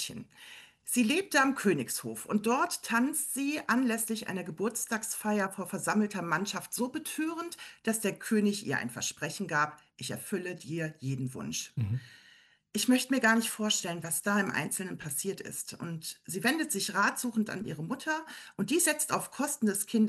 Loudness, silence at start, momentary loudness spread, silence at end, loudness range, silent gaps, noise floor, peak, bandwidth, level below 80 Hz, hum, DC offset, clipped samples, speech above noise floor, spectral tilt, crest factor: -31 LUFS; 0 s; 11 LU; 0 s; 4 LU; none; -61 dBFS; -14 dBFS; 13 kHz; -74 dBFS; none; under 0.1%; under 0.1%; 30 dB; -3.5 dB/octave; 18 dB